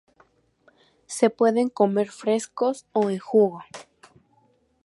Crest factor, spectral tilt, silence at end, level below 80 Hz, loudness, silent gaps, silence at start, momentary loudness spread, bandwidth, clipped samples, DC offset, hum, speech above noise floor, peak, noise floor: 20 dB; -5.5 dB/octave; 1 s; -76 dBFS; -23 LUFS; none; 1.1 s; 15 LU; 11.5 kHz; under 0.1%; under 0.1%; none; 42 dB; -4 dBFS; -64 dBFS